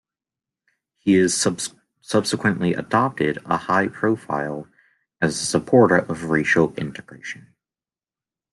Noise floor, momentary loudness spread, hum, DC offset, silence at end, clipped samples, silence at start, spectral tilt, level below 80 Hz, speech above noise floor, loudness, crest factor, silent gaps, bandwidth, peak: under -90 dBFS; 15 LU; none; under 0.1%; 1.2 s; under 0.1%; 1.05 s; -4.5 dB/octave; -60 dBFS; over 70 dB; -21 LUFS; 20 dB; none; 12.5 kHz; -2 dBFS